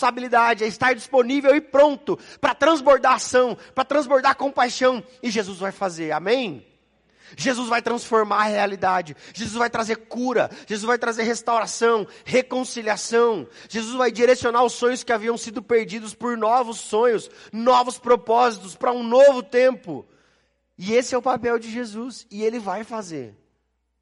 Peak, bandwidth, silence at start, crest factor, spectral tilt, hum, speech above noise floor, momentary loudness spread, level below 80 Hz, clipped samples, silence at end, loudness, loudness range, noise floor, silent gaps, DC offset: -6 dBFS; 11.5 kHz; 0 s; 16 dB; -3.5 dB/octave; none; 50 dB; 12 LU; -62 dBFS; under 0.1%; 0.7 s; -21 LUFS; 6 LU; -71 dBFS; none; under 0.1%